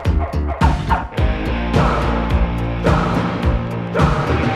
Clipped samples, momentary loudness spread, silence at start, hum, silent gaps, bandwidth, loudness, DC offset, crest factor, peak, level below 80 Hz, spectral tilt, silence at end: under 0.1%; 4 LU; 0 s; none; none; 11.5 kHz; -18 LUFS; under 0.1%; 16 dB; 0 dBFS; -22 dBFS; -7.5 dB/octave; 0 s